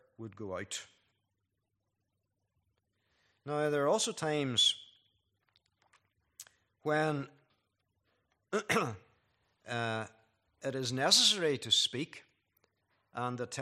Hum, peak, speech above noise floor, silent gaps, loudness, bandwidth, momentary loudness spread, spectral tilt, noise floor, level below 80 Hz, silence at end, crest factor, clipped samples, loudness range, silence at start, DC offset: none; -12 dBFS; 51 dB; none; -31 LUFS; 14 kHz; 18 LU; -2.5 dB/octave; -84 dBFS; -80 dBFS; 0 s; 26 dB; under 0.1%; 10 LU; 0.2 s; under 0.1%